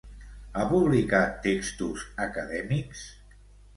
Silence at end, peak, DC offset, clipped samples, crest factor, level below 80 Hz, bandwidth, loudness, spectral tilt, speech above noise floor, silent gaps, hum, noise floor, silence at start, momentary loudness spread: 0.65 s; -8 dBFS; under 0.1%; under 0.1%; 20 dB; -46 dBFS; 11.5 kHz; -27 LUFS; -6 dB/octave; 25 dB; none; 50 Hz at -45 dBFS; -52 dBFS; 0.05 s; 19 LU